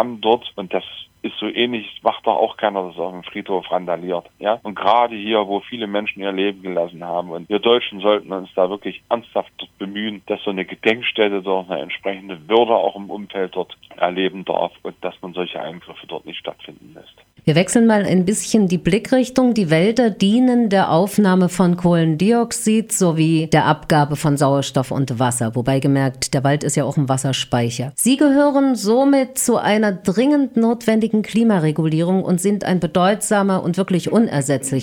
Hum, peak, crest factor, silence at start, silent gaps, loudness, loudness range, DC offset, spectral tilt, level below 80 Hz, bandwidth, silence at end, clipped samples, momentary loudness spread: none; 0 dBFS; 18 dB; 0 s; none; -18 LUFS; 6 LU; under 0.1%; -5.5 dB/octave; -54 dBFS; 18 kHz; 0 s; under 0.1%; 11 LU